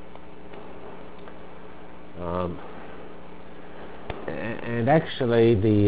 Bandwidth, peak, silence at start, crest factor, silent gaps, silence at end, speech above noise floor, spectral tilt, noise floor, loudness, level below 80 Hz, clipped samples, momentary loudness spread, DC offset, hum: 4 kHz; -8 dBFS; 0 s; 18 dB; none; 0 s; 24 dB; -11.5 dB/octave; -45 dBFS; -25 LUFS; -48 dBFS; under 0.1%; 24 LU; 2%; none